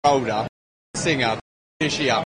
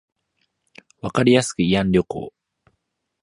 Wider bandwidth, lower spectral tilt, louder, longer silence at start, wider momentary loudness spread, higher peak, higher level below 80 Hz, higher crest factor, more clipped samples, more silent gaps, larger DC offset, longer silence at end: second, 10 kHz vs 11.5 kHz; second, -4 dB/octave vs -5.5 dB/octave; second, -23 LUFS vs -19 LUFS; second, 0.05 s vs 1.05 s; second, 12 LU vs 16 LU; about the same, -4 dBFS vs -2 dBFS; second, -54 dBFS vs -48 dBFS; about the same, 18 dB vs 20 dB; neither; first, 0.49-0.94 s, 1.41-1.80 s vs none; neither; second, 0 s vs 0.95 s